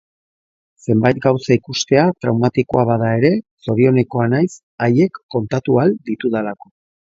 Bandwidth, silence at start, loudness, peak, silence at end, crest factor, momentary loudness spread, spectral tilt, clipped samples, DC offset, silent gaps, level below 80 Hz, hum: 7.8 kHz; 0.9 s; -17 LUFS; 0 dBFS; 0.65 s; 16 dB; 7 LU; -6.5 dB/octave; under 0.1%; under 0.1%; 3.51-3.57 s, 4.63-4.78 s, 5.23-5.29 s; -52 dBFS; none